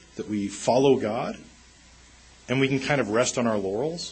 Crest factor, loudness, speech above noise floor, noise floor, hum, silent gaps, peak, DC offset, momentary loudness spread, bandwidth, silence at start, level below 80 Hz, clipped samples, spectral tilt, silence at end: 18 dB; -25 LUFS; 28 dB; -52 dBFS; none; none; -8 dBFS; under 0.1%; 10 LU; 8.8 kHz; 0.15 s; -56 dBFS; under 0.1%; -4.5 dB/octave; 0 s